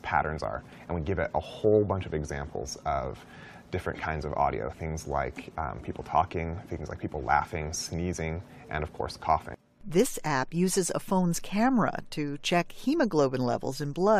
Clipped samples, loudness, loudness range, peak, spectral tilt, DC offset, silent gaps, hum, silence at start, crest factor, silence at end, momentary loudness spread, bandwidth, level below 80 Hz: under 0.1%; -30 LUFS; 5 LU; -10 dBFS; -5.5 dB/octave; under 0.1%; none; none; 0.05 s; 20 dB; 0 s; 11 LU; 15 kHz; -46 dBFS